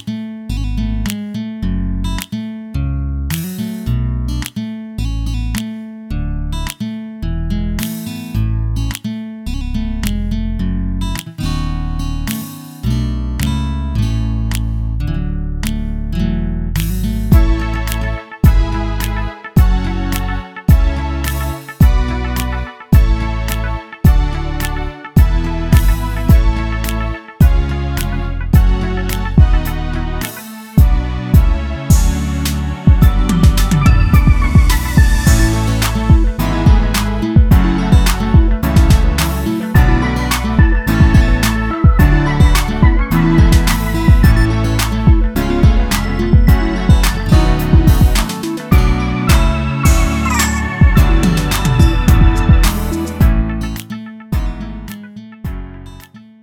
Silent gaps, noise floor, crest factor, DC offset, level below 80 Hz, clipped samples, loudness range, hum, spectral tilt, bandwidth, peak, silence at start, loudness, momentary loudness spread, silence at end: none; -37 dBFS; 12 dB; under 0.1%; -16 dBFS; under 0.1%; 9 LU; none; -6 dB/octave; 18 kHz; 0 dBFS; 0.05 s; -15 LUFS; 12 LU; 0.25 s